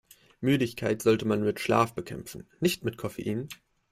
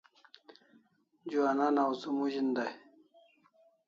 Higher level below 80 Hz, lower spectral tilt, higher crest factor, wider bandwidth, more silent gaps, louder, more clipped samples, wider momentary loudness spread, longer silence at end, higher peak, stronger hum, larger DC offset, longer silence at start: first, -60 dBFS vs -86 dBFS; about the same, -5.5 dB/octave vs -5.5 dB/octave; about the same, 20 dB vs 18 dB; first, 16 kHz vs 7.4 kHz; neither; first, -28 LUFS vs -32 LUFS; neither; about the same, 15 LU vs 13 LU; second, 0.35 s vs 1.1 s; first, -10 dBFS vs -18 dBFS; neither; neither; second, 0.4 s vs 1.25 s